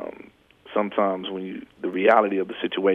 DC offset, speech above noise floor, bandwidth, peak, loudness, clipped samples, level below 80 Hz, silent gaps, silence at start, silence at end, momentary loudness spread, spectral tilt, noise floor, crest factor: under 0.1%; 27 dB; 5.8 kHz; -4 dBFS; -24 LUFS; under 0.1%; -68 dBFS; none; 0 s; 0 s; 15 LU; -7.5 dB/octave; -50 dBFS; 20 dB